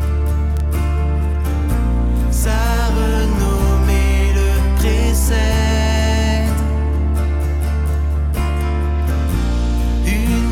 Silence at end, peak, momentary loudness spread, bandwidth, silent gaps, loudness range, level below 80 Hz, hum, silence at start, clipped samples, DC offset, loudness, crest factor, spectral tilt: 0 s; -4 dBFS; 3 LU; 15.5 kHz; none; 3 LU; -16 dBFS; none; 0 s; under 0.1%; under 0.1%; -17 LUFS; 12 dB; -6 dB/octave